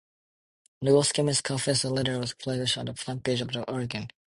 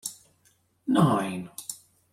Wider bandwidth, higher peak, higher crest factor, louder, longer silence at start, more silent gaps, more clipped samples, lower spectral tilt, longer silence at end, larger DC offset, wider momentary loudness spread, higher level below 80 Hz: second, 11.5 kHz vs 16.5 kHz; about the same, -10 dBFS vs -10 dBFS; about the same, 20 dB vs 20 dB; about the same, -27 LUFS vs -27 LUFS; first, 0.8 s vs 0.05 s; neither; neither; second, -4 dB/octave vs -6 dB/octave; second, 0.25 s vs 0.4 s; neither; second, 10 LU vs 17 LU; about the same, -60 dBFS vs -64 dBFS